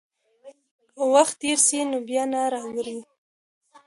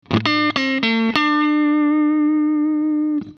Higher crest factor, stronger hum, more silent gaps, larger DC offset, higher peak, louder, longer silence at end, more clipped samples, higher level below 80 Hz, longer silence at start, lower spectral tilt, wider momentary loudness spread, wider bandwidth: about the same, 20 dB vs 18 dB; neither; first, 0.71-0.79 s vs none; neither; second, -4 dBFS vs 0 dBFS; second, -22 LUFS vs -17 LUFS; first, 0.85 s vs 0.05 s; neither; second, -74 dBFS vs -58 dBFS; first, 0.45 s vs 0.1 s; second, -1 dB/octave vs -6 dB/octave; first, 13 LU vs 3 LU; first, 11.5 kHz vs 6.6 kHz